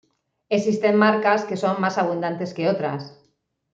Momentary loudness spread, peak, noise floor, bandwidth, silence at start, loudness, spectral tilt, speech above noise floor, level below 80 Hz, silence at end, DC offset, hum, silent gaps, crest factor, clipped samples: 10 LU; -4 dBFS; -68 dBFS; 7.8 kHz; 0.5 s; -21 LUFS; -6 dB/octave; 47 dB; -70 dBFS; 0.6 s; under 0.1%; none; none; 18 dB; under 0.1%